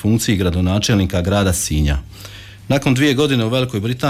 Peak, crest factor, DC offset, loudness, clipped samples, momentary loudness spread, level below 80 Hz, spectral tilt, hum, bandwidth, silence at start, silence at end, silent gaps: -6 dBFS; 12 dB; under 0.1%; -17 LUFS; under 0.1%; 14 LU; -30 dBFS; -5 dB/octave; none; 16 kHz; 0 s; 0 s; none